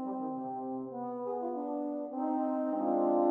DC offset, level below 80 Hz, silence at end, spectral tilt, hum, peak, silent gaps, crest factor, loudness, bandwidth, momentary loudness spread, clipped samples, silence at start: under 0.1%; -86 dBFS; 0 s; -10.5 dB/octave; none; -16 dBFS; none; 18 dB; -34 LUFS; 3.1 kHz; 9 LU; under 0.1%; 0 s